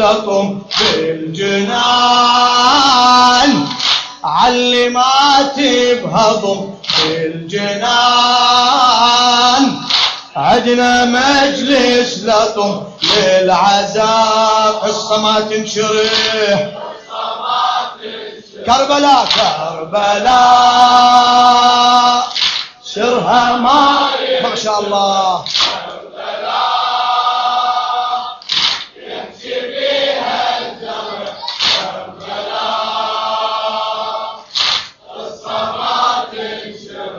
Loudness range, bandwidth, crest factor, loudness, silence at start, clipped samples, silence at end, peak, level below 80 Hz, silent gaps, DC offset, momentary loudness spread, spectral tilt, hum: 8 LU; 8 kHz; 12 dB; -12 LUFS; 0 s; under 0.1%; 0 s; 0 dBFS; -48 dBFS; none; under 0.1%; 15 LU; -2.5 dB/octave; none